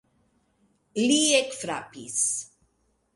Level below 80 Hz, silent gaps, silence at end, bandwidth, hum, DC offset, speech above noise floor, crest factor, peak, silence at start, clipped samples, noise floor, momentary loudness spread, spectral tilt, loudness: -72 dBFS; none; 0.7 s; 11.5 kHz; none; under 0.1%; 45 dB; 20 dB; -8 dBFS; 0.95 s; under 0.1%; -70 dBFS; 15 LU; -1.5 dB/octave; -25 LUFS